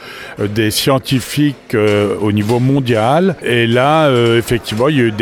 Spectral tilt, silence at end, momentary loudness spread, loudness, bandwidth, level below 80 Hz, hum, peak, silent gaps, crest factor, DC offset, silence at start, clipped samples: -5.5 dB/octave; 0 s; 5 LU; -13 LUFS; 19 kHz; -44 dBFS; none; 0 dBFS; none; 14 dB; under 0.1%; 0 s; under 0.1%